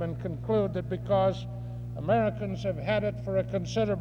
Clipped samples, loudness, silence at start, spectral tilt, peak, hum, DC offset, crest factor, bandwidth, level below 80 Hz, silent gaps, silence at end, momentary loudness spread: under 0.1%; -30 LUFS; 0 s; -7.5 dB/octave; -14 dBFS; 60 Hz at -35 dBFS; under 0.1%; 16 dB; 7.2 kHz; -48 dBFS; none; 0 s; 10 LU